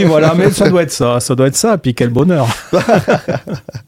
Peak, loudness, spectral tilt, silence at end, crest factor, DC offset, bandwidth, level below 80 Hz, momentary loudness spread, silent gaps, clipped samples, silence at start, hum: 0 dBFS; -12 LUFS; -5.5 dB/octave; 0.05 s; 12 dB; under 0.1%; 16.5 kHz; -42 dBFS; 5 LU; none; under 0.1%; 0 s; none